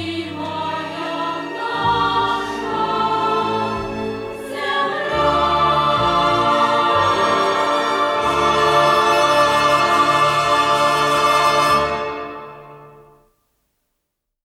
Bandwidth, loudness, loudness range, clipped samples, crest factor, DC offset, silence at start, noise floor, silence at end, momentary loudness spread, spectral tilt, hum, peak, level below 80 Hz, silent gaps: 16.5 kHz; -17 LUFS; 6 LU; under 0.1%; 14 dB; under 0.1%; 0 s; -76 dBFS; 1.55 s; 11 LU; -4 dB/octave; none; -4 dBFS; -44 dBFS; none